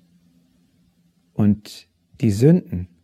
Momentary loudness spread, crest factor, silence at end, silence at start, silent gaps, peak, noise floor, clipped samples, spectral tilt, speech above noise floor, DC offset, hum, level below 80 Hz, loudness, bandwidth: 20 LU; 20 dB; 0.2 s; 1.4 s; none; -2 dBFS; -61 dBFS; under 0.1%; -8.5 dB/octave; 43 dB; under 0.1%; none; -52 dBFS; -19 LUFS; 14 kHz